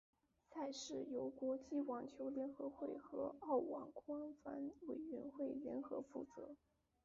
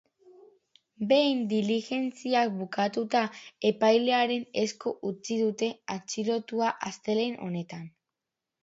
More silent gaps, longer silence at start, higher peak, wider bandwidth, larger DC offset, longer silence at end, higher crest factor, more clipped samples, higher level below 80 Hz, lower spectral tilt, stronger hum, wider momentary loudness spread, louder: neither; second, 0.5 s vs 1 s; second, -30 dBFS vs -10 dBFS; about the same, 7.4 kHz vs 8 kHz; neither; second, 0.5 s vs 0.75 s; about the same, 18 dB vs 20 dB; neither; about the same, -82 dBFS vs -78 dBFS; about the same, -5 dB/octave vs -4.5 dB/octave; neither; second, 9 LU vs 12 LU; second, -48 LUFS vs -28 LUFS